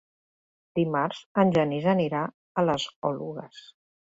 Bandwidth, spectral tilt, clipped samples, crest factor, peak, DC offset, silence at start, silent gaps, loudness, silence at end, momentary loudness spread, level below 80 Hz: 7.8 kHz; -7 dB/octave; under 0.1%; 20 dB; -8 dBFS; under 0.1%; 0.75 s; 1.26-1.35 s, 2.34-2.55 s, 2.96-3.02 s; -26 LUFS; 0.55 s; 12 LU; -66 dBFS